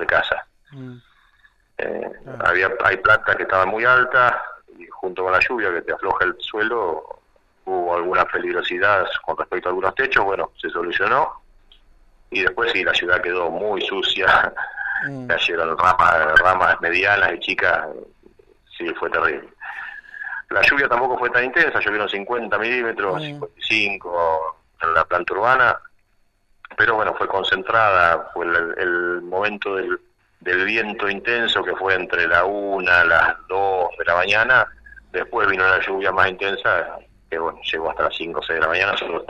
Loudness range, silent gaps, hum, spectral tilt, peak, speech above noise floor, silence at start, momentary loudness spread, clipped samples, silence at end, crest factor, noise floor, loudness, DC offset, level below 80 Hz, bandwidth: 4 LU; none; none; -4.5 dB/octave; 0 dBFS; 42 dB; 0 s; 13 LU; under 0.1%; 0.05 s; 20 dB; -61 dBFS; -19 LUFS; under 0.1%; -50 dBFS; 10 kHz